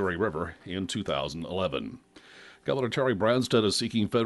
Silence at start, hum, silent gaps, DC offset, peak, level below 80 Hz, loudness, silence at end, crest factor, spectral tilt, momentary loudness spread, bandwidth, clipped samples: 0 s; none; none; under 0.1%; -10 dBFS; -56 dBFS; -28 LUFS; 0 s; 18 dB; -5 dB/octave; 11 LU; 11.5 kHz; under 0.1%